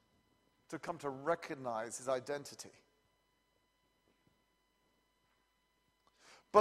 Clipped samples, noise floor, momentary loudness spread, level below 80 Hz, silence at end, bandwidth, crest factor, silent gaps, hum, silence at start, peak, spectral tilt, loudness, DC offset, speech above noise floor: under 0.1%; -78 dBFS; 12 LU; -82 dBFS; 0 s; 14.5 kHz; 28 dB; none; none; 0.7 s; -12 dBFS; -4 dB/octave; -40 LUFS; under 0.1%; 37 dB